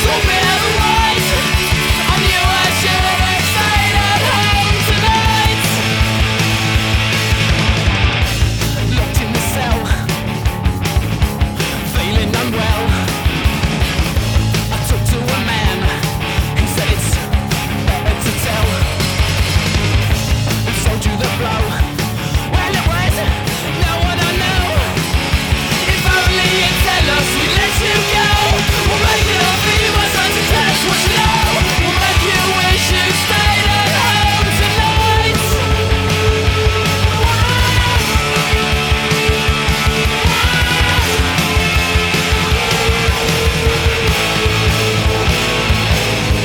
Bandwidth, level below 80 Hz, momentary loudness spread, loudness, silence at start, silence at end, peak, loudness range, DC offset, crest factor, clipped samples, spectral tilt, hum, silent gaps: over 20 kHz; -20 dBFS; 5 LU; -14 LUFS; 0 s; 0 s; 0 dBFS; 4 LU; under 0.1%; 14 dB; under 0.1%; -4 dB/octave; none; none